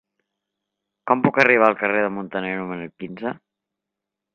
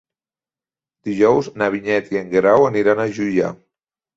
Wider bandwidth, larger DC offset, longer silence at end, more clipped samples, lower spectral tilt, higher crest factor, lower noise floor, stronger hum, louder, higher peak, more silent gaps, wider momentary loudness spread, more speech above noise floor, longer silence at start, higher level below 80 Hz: second, 7 kHz vs 7.8 kHz; neither; first, 1 s vs 0.6 s; neither; about the same, -7 dB/octave vs -6.5 dB/octave; first, 22 dB vs 16 dB; second, -85 dBFS vs under -90 dBFS; neither; about the same, -20 LUFS vs -18 LUFS; about the same, 0 dBFS vs -2 dBFS; neither; first, 18 LU vs 8 LU; second, 64 dB vs over 73 dB; about the same, 1.05 s vs 1.05 s; second, -66 dBFS vs -58 dBFS